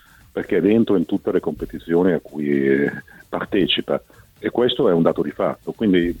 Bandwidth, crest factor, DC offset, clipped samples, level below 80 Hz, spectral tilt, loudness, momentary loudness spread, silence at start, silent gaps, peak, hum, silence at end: 18 kHz; 16 dB; under 0.1%; under 0.1%; -48 dBFS; -7.5 dB/octave; -20 LUFS; 12 LU; 0.35 s; none; -2 dBFS; none; 0 s